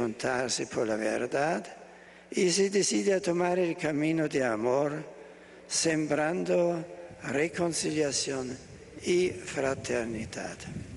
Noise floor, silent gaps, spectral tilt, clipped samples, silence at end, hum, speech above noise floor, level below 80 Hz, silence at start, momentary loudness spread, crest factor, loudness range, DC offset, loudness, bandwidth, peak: -51 dBFS; none; -4 dB/octave; under 0.1%; 0 s; none; 22 dB; -62 dBFS; 0 s; 14 LU; 16 dB; 3 LU; under 0.1%; -29 LUFS; 11.5 kHz; -14 dBFS